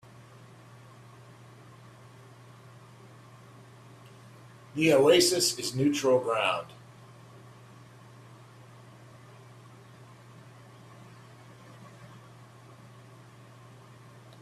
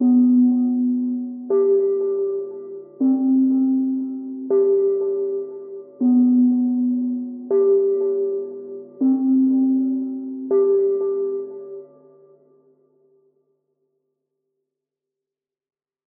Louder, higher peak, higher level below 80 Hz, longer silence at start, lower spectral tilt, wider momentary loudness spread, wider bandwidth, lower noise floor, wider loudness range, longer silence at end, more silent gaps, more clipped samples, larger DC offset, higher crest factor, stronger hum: second, -25 LUFS vs -20 LUFS; about the same, -10 dBFS vs -10 dBFS; first, -72 dBFS vs under -90 dBFS; first, 4.75 s vs 0 s; second, -3.5 dB/octave vs -13.5 dB/octave; first, 28 LU vs 16 LU; first, 15.5 kHz vs 1.5 kHz; second, -52 dBFS vs -88 dBFS; first, 26 LU vs 5 LU; second, 2.35 s vs 4.2 s; neither; neither; neither; first, 22 dB vs 12 dB; neither